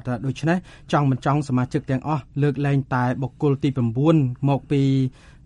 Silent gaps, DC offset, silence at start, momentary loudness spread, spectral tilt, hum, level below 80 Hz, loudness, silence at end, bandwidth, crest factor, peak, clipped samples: none; under 0.1%; 0.05 s; 5 LU; -8 dB/octave; none; -50 dBFS; -22 LUFS; 0.35 s; 9.6 kHz; 18 dB; -4 dBFS; under 0.1%